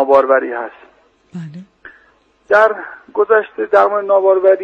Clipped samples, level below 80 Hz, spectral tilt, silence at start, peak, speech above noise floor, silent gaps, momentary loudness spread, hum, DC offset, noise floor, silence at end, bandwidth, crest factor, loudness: under 0.1%; -62 dBFS; -7 dB/octave; 0 s; 0 dBFS; 40 dB; none; 20 LU; none; under 0.1%; -54 dBFS; 0 s; 6.8 kHz; 14 dB; -13 LUFS